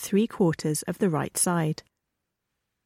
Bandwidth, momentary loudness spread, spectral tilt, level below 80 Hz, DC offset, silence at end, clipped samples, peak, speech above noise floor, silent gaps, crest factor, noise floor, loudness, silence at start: 16.5 kHz; 5 LU; -5 dB/octave; -64 dBFS; under 0.1%; 1.1 s; under 0.1%; -12 dBFS; 57 dB; none; 16 dB; -82 dBFS; -26 LUFS; 0 s